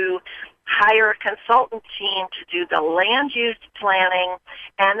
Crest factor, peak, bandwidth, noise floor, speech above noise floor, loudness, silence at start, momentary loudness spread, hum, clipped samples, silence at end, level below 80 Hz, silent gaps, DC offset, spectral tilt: 16 dB; -4 dBFS; 7.2 kHz; -39 dBFS; 19 dB; -19 LUFS; 0 s; 12 LU; none; under 0.1%; 0 s; -62 dBFS; none; under 0.1%; -4 dB/octave